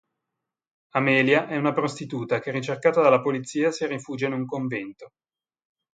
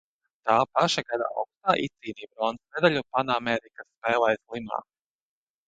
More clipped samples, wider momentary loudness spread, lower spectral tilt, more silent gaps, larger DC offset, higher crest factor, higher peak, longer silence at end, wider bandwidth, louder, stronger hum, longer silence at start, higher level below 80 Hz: neither; about the same, 10 LU vs 11 LU; first, -6 dB/octave vs -4.5 dB/octave; second, none vs 3.97-4.01 s; neither; about the same, 22 dB vs 22 dB; about the same, -4 dBFS vs -6 dBFS; about the same, 0.85 s vs 0.85 s; about the same, 9.2 kHz vs 9.2 kHz; about the same, -24 LUFS vs -26 LUFS; neither; first, 0.95 s vs 0.45 s; second, -72 dBFS vs -66 dBFS